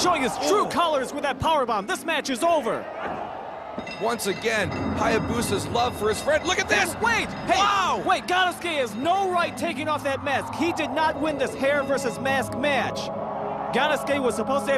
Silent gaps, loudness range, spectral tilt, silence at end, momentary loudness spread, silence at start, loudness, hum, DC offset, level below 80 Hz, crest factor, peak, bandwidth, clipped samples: none; 4 LU; -3.5 dB/octave; 0 s; 8 LU; 0 s; -24 LUFS; none; under 0.1%; -50 dBFS; 18 dB; -8 dBFS; 15.5 kHz; under 0.1%